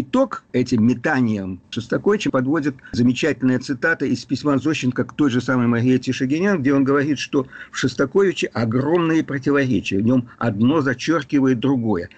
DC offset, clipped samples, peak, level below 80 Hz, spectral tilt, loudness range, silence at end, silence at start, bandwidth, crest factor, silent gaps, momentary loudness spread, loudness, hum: under 0.1%; under 0.1%; -8 dBFS; -54 dBFS; -6.5 dB/octave; 1 LU; 0.1 s; 0 s; 8.4 kHz; 12 dB; none; 5 LU; -20 LUFS; none